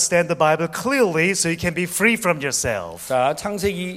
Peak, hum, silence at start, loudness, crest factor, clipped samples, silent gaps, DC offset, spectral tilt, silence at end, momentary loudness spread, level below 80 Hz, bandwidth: -2 dBFS; none; 0 s; -20 LUFS; 20 dB; under 0.1%; none; under 0.1%; -3.5 dB/octave; 0 s; 6 LU; -48 dBFS; 16 kHz